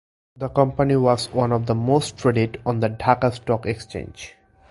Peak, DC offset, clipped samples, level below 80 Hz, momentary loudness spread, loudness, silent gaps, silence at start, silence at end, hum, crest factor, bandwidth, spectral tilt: 0 dBFS; under 0.1%; under 0.1%; -46 dBFS; 14 LU; -21 LUFS; none; 0.4 s; 0.4 s; none; 22 dB; 11.5 kHz; -6.5 dB/octave